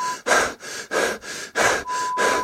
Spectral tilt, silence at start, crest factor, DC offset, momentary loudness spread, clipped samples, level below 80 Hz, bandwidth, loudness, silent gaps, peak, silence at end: -1 dB/octave; 0 s; 18 dB; under 0.1%; 8 LU; under 0.1%; -54 dBFS; 16.5 kHz; -22 LUFS; none; -4 dBFS; 0 s